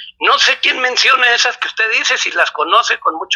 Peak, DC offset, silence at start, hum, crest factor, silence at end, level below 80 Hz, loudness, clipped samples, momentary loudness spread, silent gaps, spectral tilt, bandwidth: 0 dBFS; under 0.1%; 0 s; none; 14 dB; 0 s; -64 dBFS; -12 LUFS; under 0.1%; 6 LU; none; 2 dB/octave; 12 kHz